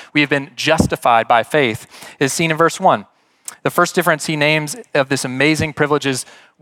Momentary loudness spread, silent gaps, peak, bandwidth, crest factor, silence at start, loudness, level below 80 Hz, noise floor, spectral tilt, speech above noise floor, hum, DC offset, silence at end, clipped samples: 10 LU; none; 0 dBFS; 18 kHz; 16 dB; 0 s; -16 LUFS; -48 dBFS; -38 dBFS; -4 dB/octave; 21 dB; none; under 0.1%; 0.4 s; under 0.1%